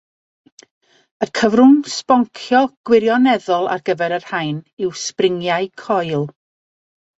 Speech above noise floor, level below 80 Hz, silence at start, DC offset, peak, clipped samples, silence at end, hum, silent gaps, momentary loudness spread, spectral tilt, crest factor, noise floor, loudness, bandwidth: over 74 dB; -62 dBFS; 1.2 s; under 0.1%; -2 dBFS; under 0.1%; 0.9 s; none; 2.77-2.84 s, 4.73-4.77 s; 12 LU; -5 dB/octave; 16 dB; under -90 dBFS; -17 LUFS; 8 kHz